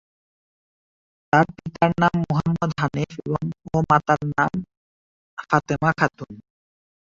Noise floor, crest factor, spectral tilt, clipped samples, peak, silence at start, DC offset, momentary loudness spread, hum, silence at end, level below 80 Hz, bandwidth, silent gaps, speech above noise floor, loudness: under -90 dBFS; 20 dB; -7 dB/octave; under 0.1%; -2 dBFS; 1.35 s; under 0.1%; 10 LU; none; 0.65 s; -50 dBFS; 7.4 kHz; 4.77-5.37 s; over 68 dB; -22 LUFS